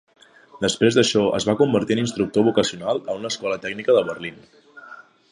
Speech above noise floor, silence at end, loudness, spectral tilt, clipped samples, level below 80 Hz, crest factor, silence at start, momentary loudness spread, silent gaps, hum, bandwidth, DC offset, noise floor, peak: 24 dB; 0.3 s; -21 LUFS; -4.5 dB/octave; under 0.1%; -56 dBFS; 18 dB; 0.55 s; 11 LU; none; none; 11 kHz; under 0.1%; -44 dBFS; -4 dBFS